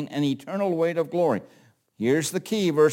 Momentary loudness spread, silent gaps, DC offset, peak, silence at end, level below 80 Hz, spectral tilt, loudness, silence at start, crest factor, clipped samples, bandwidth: 4 LU; none; under 0.1%; -8 dBFS; 0 s; -72 dBFS; -5.5 dB/octave; -25 LUFS; 0 s; 16 dB; under 0.1%; 17 kHz